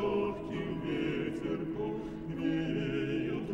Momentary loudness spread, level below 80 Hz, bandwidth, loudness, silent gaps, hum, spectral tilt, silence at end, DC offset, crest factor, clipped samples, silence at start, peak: 5 LU; -54 dBFS; 8.8 kHz; -35 LUFS; none; none; -8 dB/octave; 0 s; under 0.1%; 12 dB; under 0.1%; 0 s; -22 dBFS